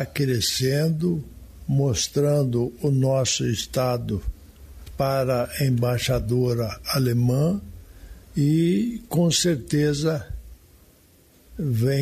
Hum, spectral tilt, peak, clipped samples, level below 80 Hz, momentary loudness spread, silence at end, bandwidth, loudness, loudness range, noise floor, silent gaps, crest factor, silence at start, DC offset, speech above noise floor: none; -5.5 dB/octave; -10 dBFS; under 0.1%; -42 dBFS; 10 LU; 0 s; 14.5 kHz; -23 LUFS; 2 LU; -55 dBFS; none; 14 dB; 0 s; under 0.1%; 33 dB